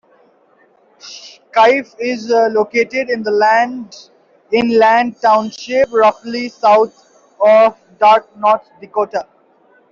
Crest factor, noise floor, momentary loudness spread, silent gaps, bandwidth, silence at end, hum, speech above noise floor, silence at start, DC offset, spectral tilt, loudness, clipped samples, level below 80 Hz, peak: 12 dB; -53 dBFS; 12 LU; none; 7.4 kHz; 0.7 s; none; 40 dB; 1.05 s; under 0.1%; -4.5 dB/octave; -14 LUFS; under 0.1%; -60 dBFS; -2 dBFS